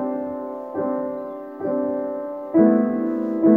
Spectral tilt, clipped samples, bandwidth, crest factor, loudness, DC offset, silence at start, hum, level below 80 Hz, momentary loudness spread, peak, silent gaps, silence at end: -11.5 dB/octave; under 0.1%; 2.4 kHz; 18 dB; -23 LUFS; under 0.1%; 0 s; none; -66 dBFS; 13 LU; -4 dBFS; none; 0 s